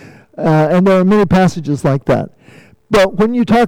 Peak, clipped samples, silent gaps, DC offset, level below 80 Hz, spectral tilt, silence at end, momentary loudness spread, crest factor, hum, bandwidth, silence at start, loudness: -6 dBFS; under 0.1%; none; under 0.1%; -38 dBFS; -7.5 dB/octave; 0 s; 7 LU; 8 dB; none; 14 kHz; 0.4 s; -13 LUFS